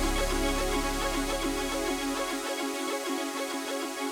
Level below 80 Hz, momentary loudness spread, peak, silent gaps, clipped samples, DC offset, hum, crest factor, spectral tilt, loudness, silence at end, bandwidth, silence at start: -38 dBFS; 4 LU; -16 dBFS; none; under 0.1%; under 0.1%; none; 14 dB; -3 dB/octave; -30 LUFS; 0 s; over 20 kHz; 0 s